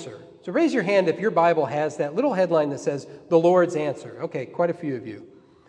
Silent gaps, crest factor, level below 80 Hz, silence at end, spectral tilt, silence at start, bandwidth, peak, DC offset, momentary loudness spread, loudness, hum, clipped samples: none; 18 dB; -72 dBFS; 0.45 s; -6.5 dB/octave; 0 s; 10 kHz; -6 dBFS; under 0.1%; 14 LU; -23 LUFS; none; under 0.1%